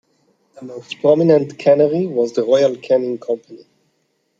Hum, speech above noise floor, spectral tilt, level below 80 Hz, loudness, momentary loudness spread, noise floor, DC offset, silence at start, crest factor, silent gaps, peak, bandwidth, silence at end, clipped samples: none; 50 dB; -7 dB/octave; -68 dBFS; -16 LUFS; 13 LU; -66 dBFS; under 0.1%; 0.6 s; 16 dB; none; -2 dBFS; 7.8 kHz; 0.85 s; under 0.1%